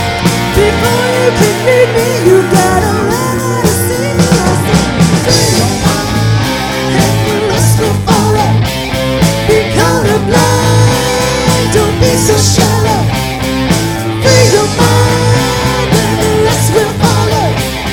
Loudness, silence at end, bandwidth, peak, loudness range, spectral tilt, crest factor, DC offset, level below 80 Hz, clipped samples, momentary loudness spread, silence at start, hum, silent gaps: -10 LUFS; 0 s; 18.5 kHz; 0 dBFS; 1 LU; -4.5 dB/octave; 10 dB; under 0.1%; -26 dBFS; 1%; 4 LU; 0 s; none; none